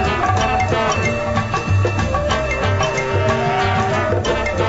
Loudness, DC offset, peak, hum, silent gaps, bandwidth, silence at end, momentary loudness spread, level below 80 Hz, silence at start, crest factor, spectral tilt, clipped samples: -18 LUFS; under 0.1%; -4 dBFS; none; none; 8 kHz; 0 s; 2 LU; -30 dBFS; 0 s; 14 dB; -5.5 dB/octave; under 0.1%